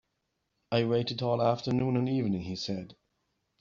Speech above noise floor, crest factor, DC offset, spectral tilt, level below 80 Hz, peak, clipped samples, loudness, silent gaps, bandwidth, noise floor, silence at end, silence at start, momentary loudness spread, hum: 51 dB; 18 dB; under 0.1%; -6 dB/octave; -64 dBFS; -12 dBFS; under 0.1%; -30 LUFS; none; 7.4 kHz; -80 dBFS; 0.65 s; 0.7 s; 8 LU; none